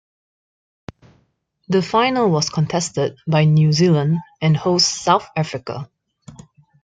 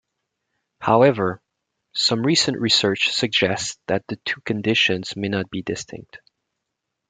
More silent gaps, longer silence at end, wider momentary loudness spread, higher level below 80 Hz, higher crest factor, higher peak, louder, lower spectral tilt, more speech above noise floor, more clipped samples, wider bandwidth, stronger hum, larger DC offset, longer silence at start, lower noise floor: neither; second, 0.5 s vs 0.95 s; second, 10 LU vs 13 LU; about the same, -56 dBFS vs -60 dBFS; about the same, 18 dB vs 20 dB; about the same, -2 dBFS vs -2 dBFS; about the same, -18 LUFS vs -20 LUFS; first, -5.5 dB/octave vs -3.5 dB/octave; second, 47 dB vs 59 dB; neither; about the same, 9.2 kHz vs 9.6 kHz; neither; neither; first, 1.7 s vs 0.8 s; second, -65 dBFS vs -80 dBFS